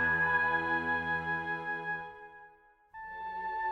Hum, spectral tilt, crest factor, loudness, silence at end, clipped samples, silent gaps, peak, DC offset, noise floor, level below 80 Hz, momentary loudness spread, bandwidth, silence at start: none; -6 dB/octave; 16 dB; -32 LUFS; 0 s; under 0.1%; none; -18 dBFS; under 0.1%; -60 dBFS; -60 dBFS; 20 LU; 8 kHz; 0 s